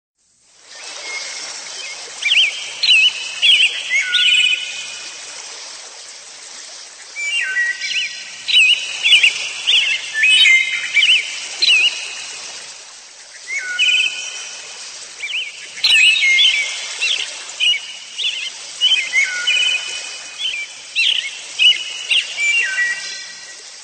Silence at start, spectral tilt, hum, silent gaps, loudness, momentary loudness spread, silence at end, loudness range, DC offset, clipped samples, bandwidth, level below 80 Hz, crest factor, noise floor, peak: 0.7 s; 4 dB/octave; none; none; -14 LUFS; 20 LU; 0 s; 8 LU; under 0.1%; under 0.1%; 15 kHz; -72 dBFS; 18 dB; -53 dBFS; 0 dBFS